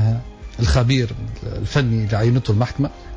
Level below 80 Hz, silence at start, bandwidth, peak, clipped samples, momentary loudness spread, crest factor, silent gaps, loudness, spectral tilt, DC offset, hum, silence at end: -30 dBFS; 0 s; 8 kHz; -6 dBFS; under 0.1%; 11 LU; 12 dB; none; -20 LUFS; -6.5 dB/octave; under 0.1%; none; 0 s